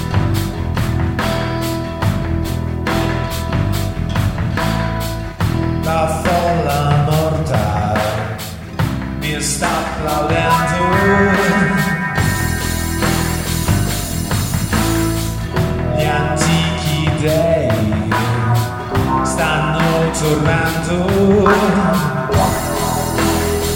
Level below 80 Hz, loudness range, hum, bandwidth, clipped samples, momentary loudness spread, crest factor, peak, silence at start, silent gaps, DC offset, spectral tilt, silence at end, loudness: -28 dBFS; 4 LU; none; 19.5 kHz; under 0.1%; 6 LU; 16 dB; 0 dBFS; 0 s; none; under 0.1%; -5.5 dB/octave; 0 s; -16 LUFS